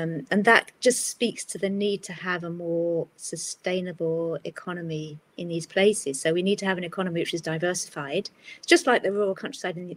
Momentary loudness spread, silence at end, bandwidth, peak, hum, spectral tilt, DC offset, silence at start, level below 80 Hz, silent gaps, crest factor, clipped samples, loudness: 14 LU; 0 s; 16 kHz; -2 dBFS; none; -4 dB/octave; under 0.1%; 0 s; -74 dBFS; none; 24 dB; under 0.1%; -26 LUFS